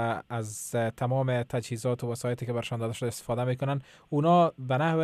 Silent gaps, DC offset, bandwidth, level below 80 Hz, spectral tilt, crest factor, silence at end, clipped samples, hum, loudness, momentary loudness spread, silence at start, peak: none; under 0.1%; 15 kHz; -64 dBFS; -6.5 dB/octave; 16 dB; 0 s; under 0.1%; none; -29 LUFS; 9 LU; 0 s; -12 dBFS